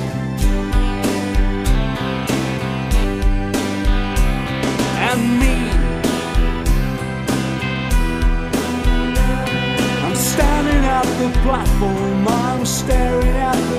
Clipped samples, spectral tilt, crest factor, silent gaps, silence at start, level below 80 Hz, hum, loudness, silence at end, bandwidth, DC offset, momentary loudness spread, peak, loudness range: under 0.1%; -5 dB/octave; 14 dB; none; 0 s; -20 dBFS; none; -19 LUFS; 0 s; 15.5 kHz; under 0.1%; 4 LU; -2 dBFS; 3 LU